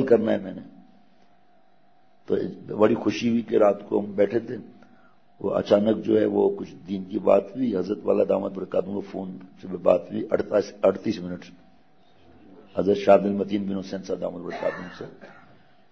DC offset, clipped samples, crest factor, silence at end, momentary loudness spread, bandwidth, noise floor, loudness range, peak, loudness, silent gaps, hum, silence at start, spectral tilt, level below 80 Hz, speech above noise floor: 0.2%; under 0.1%; 20 dB; 0.6 s; 15 LU; 7.4 kHz; -62 dBFS; 3 LU; -4 dBFS; -24 LUFS; none; none; 0 s; -7.5 dB/octave; -66 dBFS; 38 dB